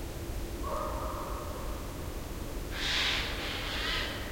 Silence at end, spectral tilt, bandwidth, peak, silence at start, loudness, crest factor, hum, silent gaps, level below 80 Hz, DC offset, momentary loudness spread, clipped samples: 0 s; -3.5 dB/octave; 16.5 kHz; -18 dBFS; 0 s; -34 LUFS; 16 dB; none; none; -40 dBFS; under 0.1%; 11 LU; under 0.1%